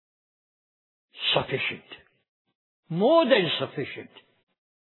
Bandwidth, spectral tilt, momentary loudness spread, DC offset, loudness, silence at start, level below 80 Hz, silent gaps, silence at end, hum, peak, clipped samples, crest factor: 4.3 kHz; -8 dB/octave; 16 LU; under 0.1%; -24 LUFS; 1.15 s; -68 dBFS; 2.28-2.45 s, 2.55-2.83 s; 0.8 s; none; -6 dBFS; under 0.1%; 22 dB